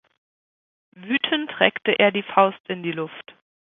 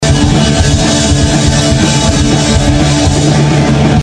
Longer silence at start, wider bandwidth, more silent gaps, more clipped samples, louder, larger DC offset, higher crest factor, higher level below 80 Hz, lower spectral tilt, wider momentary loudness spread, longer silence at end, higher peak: first, 1 s vs 0 s; second, 4.1 kHz vs 10.5 kHz; first, 2.60-2.64 s vs none; second, under 0.1% vs 0.1%; second, -21 LUFS vs -9 LUFS; neither; first, 24 dB vs 8 dB; second, -70 dBFS vs -18 dBFS; first, -8.5 dB/octave vs -5 dB/octave; first, 12 LU vs 1 LU; first, 0.55 s vs 0 s; about the same, 0 dBFS vs 0 dBFS